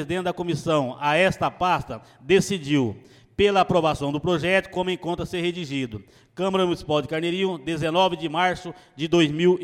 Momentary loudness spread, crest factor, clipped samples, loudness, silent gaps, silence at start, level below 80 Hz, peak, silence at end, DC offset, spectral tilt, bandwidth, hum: 12 LU; 18 dB; under 0.1%; -23 LUFS; none; 0 s; -50 dBFS; -6 dBFS; 0 s; under 0.1%; -5.5 dB/octave; 13.5 kHz; none